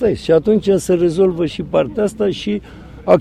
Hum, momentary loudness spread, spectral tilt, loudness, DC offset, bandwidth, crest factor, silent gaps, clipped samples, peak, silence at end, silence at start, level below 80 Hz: none; 9 LU; -6.5 dB/octave; -16 LUFS; under 0.1%; 13.5 kHz; 16 dB; none; under 0.1%; 0 dBFS; 0 s; 0 s; -42 dBFS